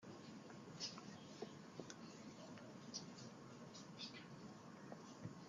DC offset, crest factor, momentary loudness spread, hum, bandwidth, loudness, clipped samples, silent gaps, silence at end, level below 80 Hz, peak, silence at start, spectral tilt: under 0.1%; 20 dB; 7 LU; none; 12 kHz; -55 LUFS; under 0.1%; none; 0 s; -88 dBFS; -34 dBFS; 0 s; -4 dB/octave